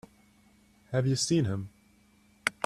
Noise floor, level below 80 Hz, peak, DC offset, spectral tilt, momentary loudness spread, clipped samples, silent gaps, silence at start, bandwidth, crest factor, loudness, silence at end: -63 dBFS; -64 dBFS; -8 dBFS; under 0.1%; -5 dB/octave; 11 LU; under 0.1%; none; 0.9 s; 13 kHz; 24 dB; -30 LUFS; 0 s